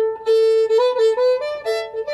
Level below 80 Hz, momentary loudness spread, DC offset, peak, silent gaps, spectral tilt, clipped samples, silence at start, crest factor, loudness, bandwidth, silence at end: -64 dBFS; 8 LU; under 0.1%; -8 dBFS; none; -1.5 dB/octave; under 0.1%; 0 s; 10 dB; -18 LUFS; 11.5 kHz; 0 s